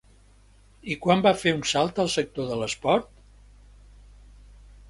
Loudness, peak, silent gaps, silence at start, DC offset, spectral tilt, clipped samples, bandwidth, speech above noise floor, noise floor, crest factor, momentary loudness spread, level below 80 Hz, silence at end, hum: -24 LUFS; -4 dBFS; none; 0.85 s; under 0.1%; -4.5 dB/octave; under 0.1%; 11.5 kHz; 31 dB; -55 dBFS; 22 dB; 9 LU; -52 dBFS; 1.85 s; 50 Hz at -50 dBFS